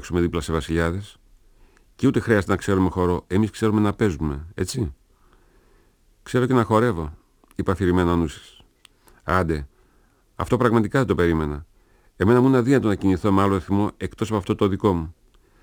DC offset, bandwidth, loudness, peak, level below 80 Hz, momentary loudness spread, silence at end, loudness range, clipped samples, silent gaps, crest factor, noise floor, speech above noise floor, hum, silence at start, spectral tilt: under 0.1%; over 20 kHz; -22 LUFS; -2 dBFS; -40 dBFS; 11 LU; 0.5 s; 5 LU; under 0.1%; none; 20 dB; -59 dBFS; 38 dB; none; 0 s; -7 dB/octave